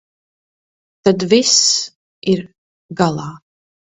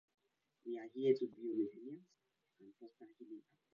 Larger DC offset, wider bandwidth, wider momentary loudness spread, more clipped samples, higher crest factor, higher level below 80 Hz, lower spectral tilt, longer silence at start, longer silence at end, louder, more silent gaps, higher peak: neither; first, 8.4 kHz vs 6.8 kHz; second, 18 LU vs 24 LU; neither; about the same, 18 dB vs 22 dB; first, -56 dBFS vs under -90 dBFS; second, -3 dB/octave vs -7 dB/octave; first, 1.05 s vs 0.65 s; first, 0.6 s vs 0.35 s; first, -15 LUFS vs -40 LUFS; first, 1.95-2.22 s, 2.58-2.89 s vs none; first, 0 dBFS vs -22 dBFS